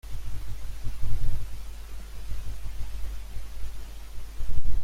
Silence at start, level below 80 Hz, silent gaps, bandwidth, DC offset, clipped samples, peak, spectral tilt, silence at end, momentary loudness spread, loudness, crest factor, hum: 0.05 s; -32 dBFS; none; 10.5 kHz; under 0.1%; under 0.1%; -6 dBFS; -5 dB/octave; 0 s; 9 LU; -40 LUFS; 14 dB; none